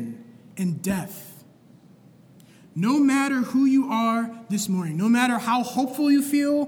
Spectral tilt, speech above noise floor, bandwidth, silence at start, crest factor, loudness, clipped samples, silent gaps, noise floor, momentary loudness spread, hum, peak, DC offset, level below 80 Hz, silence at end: -5 dB/octave; 30 dB; 19 kHz; 0 s; 16 dB; -23 LUFS; under 0.1%; none; -52 dBFS; 17 LU; none; -8 dBFS; under 0.1%; -66 dBFS; 0 s